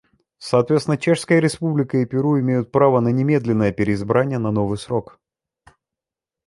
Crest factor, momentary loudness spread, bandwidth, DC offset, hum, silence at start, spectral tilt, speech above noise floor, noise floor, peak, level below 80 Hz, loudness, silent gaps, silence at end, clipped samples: 18 dB; 6 LU; 11.5 kHz; under 0.1%; none; 0.4 s; -7 dB/octave; 70 dB; -88 dBFS; -2 dBFS; -52 dBFS; -19 LUFS; none; 1.45 s; under 0.1%